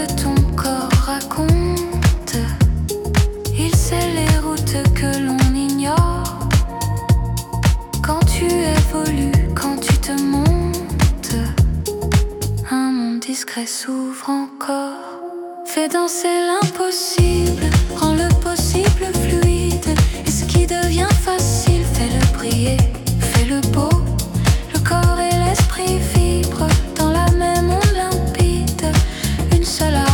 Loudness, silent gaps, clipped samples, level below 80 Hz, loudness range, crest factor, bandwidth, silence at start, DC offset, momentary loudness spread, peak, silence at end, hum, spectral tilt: -17 LUFS; none; under 0.1%; -22 dBFS; 4 LU; 14 dB; 18 kHz; 0 s; under 0.1%; 6 LU; -2 dBFS; 0 s; none; -5 dB/octave